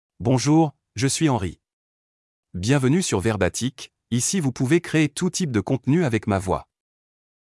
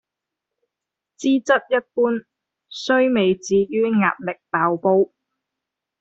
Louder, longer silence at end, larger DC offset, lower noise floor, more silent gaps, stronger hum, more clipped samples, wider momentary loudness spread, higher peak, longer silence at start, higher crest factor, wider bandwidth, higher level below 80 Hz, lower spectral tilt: about the same, -22 LUFS vs -20 LUFS; about the same, 0.9 s vs 0.95 s; neither; first, under -90 dBFS vs -85 dBFS; first, 1.73-2.43 s vs none; neither; neither; about the same, 9 LU vs 8 LU; about the same, -6 dBFS vs -4 dBFS; second, 0.2 s vs 1.2 s; about the same, 16 dB vs 18 dB; first, 12 kHz vs 8 kHz; first, -54 dBFS vs -64 dBFS; about the same, -5.5 dB/octave vs -5.5 dB/octave